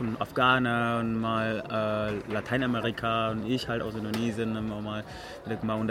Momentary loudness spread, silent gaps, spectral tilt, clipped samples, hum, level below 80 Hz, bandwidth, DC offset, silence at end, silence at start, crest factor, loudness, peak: 10 LU; none; -6.5 dB/octave; under 0.1%; none; -54 dBFS; 16 kHz; under 0.1%; 0 s; 0 s; 18 dB; -29 LUFS; -10 dBFS